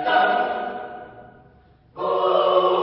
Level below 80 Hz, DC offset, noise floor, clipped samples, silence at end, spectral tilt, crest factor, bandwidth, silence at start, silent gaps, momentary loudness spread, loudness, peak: -62 dBFS; under 0.1%; -53 dBFS; under 0.1%; 0 s; -8.5 dB/octave; 18 dB; 5.8 kHz; 0 s; none; 19 LU; -21 LUFS; -4 dBFS